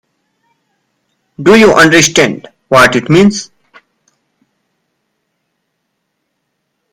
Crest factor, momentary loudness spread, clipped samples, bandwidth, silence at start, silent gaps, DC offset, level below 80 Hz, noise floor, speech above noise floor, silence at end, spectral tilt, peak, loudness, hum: 12 dB; 15 LU; 0.7%; over 20 kHz; 1.4 s; none; under 0.1%; -44 dBFS; -68 dBFS; 61 dB; 3.5 s; -4 dB/octave; 0 dBFS; -7 LUFS; none